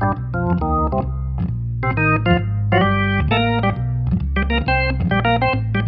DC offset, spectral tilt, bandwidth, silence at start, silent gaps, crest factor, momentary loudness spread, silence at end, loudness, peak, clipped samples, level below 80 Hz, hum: under 0.1%; -10 dB/octave; 5.2 kHz; 0 s; none; 14 dB; 6 LU; 0 s; -19 LUFS; -4 dBFS; under 0.1%; -26 dBFS; none